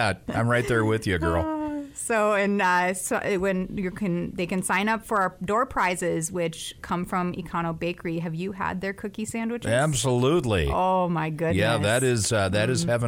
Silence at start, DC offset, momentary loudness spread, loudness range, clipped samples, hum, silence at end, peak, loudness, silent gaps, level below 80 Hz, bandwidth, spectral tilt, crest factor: 0 s; under 0.1%; 8 LU; 5 LU; under 0.1%; none; 0 s; -10 dBFS; -25 LUFS; none; -44 dBFS; 16.5 kHz; -5 dB/octave; 14 dB